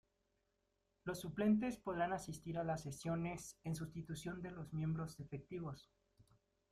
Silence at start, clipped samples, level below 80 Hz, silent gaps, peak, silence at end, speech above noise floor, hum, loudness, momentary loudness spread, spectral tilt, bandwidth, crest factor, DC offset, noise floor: 1.05 s; under 0.1%; -68 dBFS; none; -26 dBFS; 0.5 s; 41 dB; none; -43 LUFS; 12 LU; -6.5 dB/octave; 14.5 kHz; 18 dB; under 0.1%; -84 dBFS